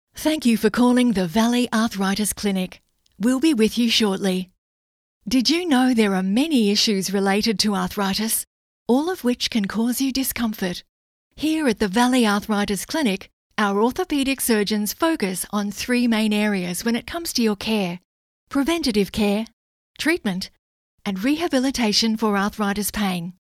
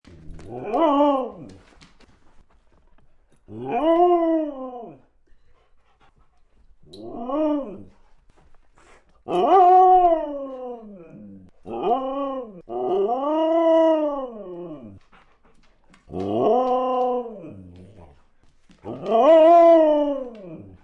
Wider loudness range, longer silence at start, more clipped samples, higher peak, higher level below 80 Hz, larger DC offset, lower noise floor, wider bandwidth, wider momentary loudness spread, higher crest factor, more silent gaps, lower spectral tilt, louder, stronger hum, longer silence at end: second, 4 LU vs 13 LU; about the same, 0.15 s vs 0.25 s; neither; about the same, -4 dBFS vs -6 dBFS; about the same, -50 dBFS vs -54 dBFS; neither; first, under -90 dBFS vs -56 dBFS; first, 16 kHz vs 7 kHz; second, 9 LU vs 24 LU; about the same, 16 dB vs 16 dB; first, 4.58-5.21 s, 8.47-8.86 s, 10.89-11.31 s, 13.33-13.50 s, 18.05-18.47 s, 19.53-19.94 s, 20.59-20.98 s vs none; second, -4 dB/octave vs -7.5 dB/octave; about the same, -21 LUFS vs -19 LUFS; neither; about the same, 0.1 s vs 0.2 s